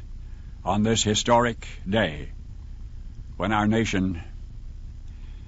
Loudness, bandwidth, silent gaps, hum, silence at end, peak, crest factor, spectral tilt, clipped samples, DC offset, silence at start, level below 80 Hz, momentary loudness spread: -24 LUFS; 8 kHz; none; none; 0 s; -6 dBFS; 20 dB; -4.5 dB/octave; under 0.1%; under 0.1%; 0 s; -38 dBFS; 22 LU